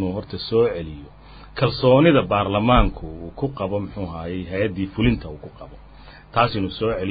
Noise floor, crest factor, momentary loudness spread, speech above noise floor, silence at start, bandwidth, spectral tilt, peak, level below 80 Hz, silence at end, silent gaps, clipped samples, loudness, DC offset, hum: -44 dBFS; 20 dB; 19 LU; 23 dB; 0 s; 5 kHz; -11.5 dB/octave; -2 dBFS; -34 dBFS; 0 s; none; under 0.1%; -21 LUFS; under 0.1%; none